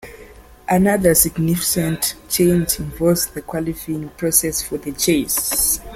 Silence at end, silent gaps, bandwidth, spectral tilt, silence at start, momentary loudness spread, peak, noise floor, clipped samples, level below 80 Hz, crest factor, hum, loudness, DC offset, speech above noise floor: 0 s; none; 16.5 kHz; -4 dB/octave; 0.05 s; 11 LU; 0 dBFS; -42 dBFS; under 0.1%; -40 dBFS; 18 dB; none; -18 LUFS; under 0.1%; 24 dB